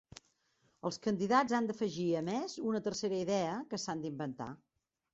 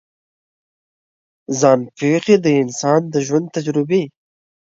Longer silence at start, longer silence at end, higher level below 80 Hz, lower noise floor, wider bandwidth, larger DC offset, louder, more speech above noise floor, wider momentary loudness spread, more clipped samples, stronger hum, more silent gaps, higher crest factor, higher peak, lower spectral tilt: second, 0.85 s vs 1.5 s; about the same, 0.6 s vs 0.7 s; second, -72 dBFS vs -66 dBFS; second, -75 dBFS vs under -90 dBFS; about the same, 8 kHz vs 7.8 kHz; neither; second, -35 LUFS vs -17 LUFS; second, 40 dB vs over 74 dB; first, 11 LU vs 7 LU; neither; neither; neither; about the same, 20 dB vs 18 dB; second, -16 dBFS vs 0 dBFS; about the same, -4.5 dB/octave vs -5.5 dB/octave